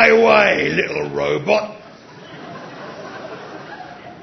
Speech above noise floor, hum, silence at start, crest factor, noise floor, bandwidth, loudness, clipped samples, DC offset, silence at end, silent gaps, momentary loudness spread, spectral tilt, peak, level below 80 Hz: 21 dB; none; 0 s; 18 dB; -40 dBFS; 6.4 kHz; -16 LUFS; under 0.1%; under 0.1%; 0.05 s; none; 23 LU; -5 dB/octave; 0 dBFS; -54 dBFS